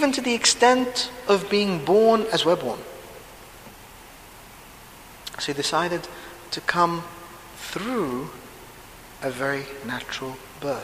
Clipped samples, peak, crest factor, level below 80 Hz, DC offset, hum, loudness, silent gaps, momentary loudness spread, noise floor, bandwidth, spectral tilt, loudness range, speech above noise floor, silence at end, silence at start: under 0.1%; -2 dBFS; 24 dB; -54 dBFS; under 0.1%; none; -23 LUFS; none; 26 LU; -45 dBFS; 15.5 kHz; -3 dB/octave; 10 LU; 22 dB; 0 s; 0 s